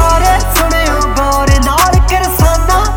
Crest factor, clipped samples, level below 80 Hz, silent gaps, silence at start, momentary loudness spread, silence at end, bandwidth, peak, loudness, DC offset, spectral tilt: 10 dB; under 0.1%; -14 dBFS; none; 0 s; 3 LU; 0 s; 19 kHz; 0 dBFS; -10 LUFS; under 0.1%; -4.5 dB/octave